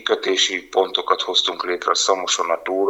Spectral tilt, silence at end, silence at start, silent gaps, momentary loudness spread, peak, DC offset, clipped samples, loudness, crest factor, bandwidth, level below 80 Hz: 0 dB/octave; 0 s; 0 s; none; 4 LU; -2 dBFS; under 0.1%; under 0.1%; -19 LUFS; 18 dB; 15.5 kHz; -64 dBFS